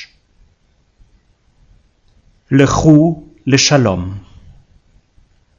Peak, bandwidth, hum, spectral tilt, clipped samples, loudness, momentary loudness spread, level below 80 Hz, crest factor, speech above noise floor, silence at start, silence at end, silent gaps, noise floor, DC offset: 0 dBFS; 7.6 kHz; none; -5 dB/octave; 0.1%; -12 LUFS; 15 LU; -40 dBFS; 16 dB; 46 dB; 0 s; 1.4 s; none; -56 dBFS; under 0.1%